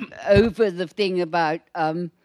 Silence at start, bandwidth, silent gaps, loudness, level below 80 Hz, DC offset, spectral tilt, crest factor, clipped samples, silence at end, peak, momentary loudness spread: 0 s; 11.5 kHz; none; -22 LUFS; -42 dBFS; under 0.1%; -7 dB/octave; 18 dB; under 0.1%; 0.15 s; -4 dBFS; 7 LU